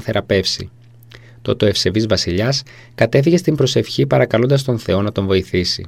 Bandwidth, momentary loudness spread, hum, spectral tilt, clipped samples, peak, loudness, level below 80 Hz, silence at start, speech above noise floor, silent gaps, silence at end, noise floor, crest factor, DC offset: 15.5 kHz; 8 LU; none; -5.5 dB/octave; under 0.1%; 0 dBFS; -16 LUFS; -44 dBFS; 0 s; 26 dB; none; 0 s; -42 dBFS; 16 dB; 0.2%